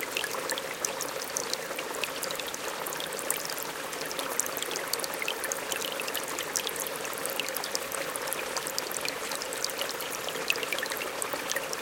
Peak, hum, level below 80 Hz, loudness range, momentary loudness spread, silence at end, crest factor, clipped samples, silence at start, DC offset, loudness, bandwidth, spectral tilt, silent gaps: -4 dBFS; none; -68 dBFS; 1 LU; 3 LU; 0 s; 30 dB; under 0.1%; 0 s; under 0.1%; -31 LUFS; 17 kHz; -0.5 dB/octave; none